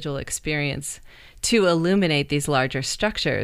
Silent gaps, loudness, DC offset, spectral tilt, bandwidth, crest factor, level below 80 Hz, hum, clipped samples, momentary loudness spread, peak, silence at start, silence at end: none; -22 LUFS; under 0.1%; -4 dB/octave; 15.5 kHz; 18 dB; -44 dBFS; none; under 0.1%; 9 LU; -6 dBFS; 0 s; 0 s